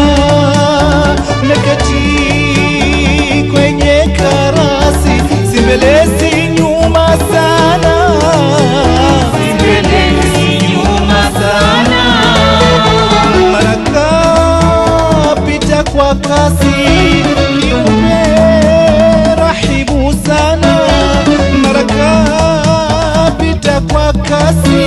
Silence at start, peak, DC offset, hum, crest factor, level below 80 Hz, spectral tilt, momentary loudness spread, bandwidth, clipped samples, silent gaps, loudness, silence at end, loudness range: 0 s; 0 dBFS; under 0.1%; none; 8 dB; -18 dBFS; -5.5 dB/octave; 4 LU; 13 kHz; under 0.1%; none; -9 LUFS; 0 s; 2 LU